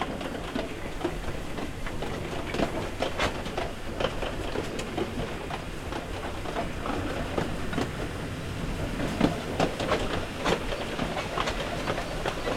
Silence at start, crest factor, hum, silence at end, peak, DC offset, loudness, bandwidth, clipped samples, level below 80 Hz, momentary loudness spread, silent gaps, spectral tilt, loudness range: 0 s; 22 dB; none; 0 s; -8 dBFS; under 0.1%; -31 LUFS; 16.5 kHz; under 0.1%; -40 dBFS; 7 LU; none; -5 dB/octave; 4 LU